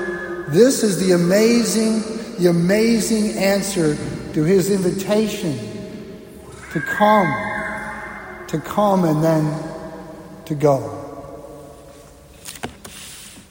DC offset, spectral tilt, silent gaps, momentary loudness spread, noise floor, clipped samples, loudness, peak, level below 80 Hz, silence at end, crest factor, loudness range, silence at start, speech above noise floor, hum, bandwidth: under 0.1%; -5.5 dB/octave; none; 21 LU; -43 dBFS; under 0.1%; -18 LUFS; -2 dBFS; -48 dBFS; 0.1 s; 18 dB; 9 LU; 0 s; 26 dB; none; 16.5 kHz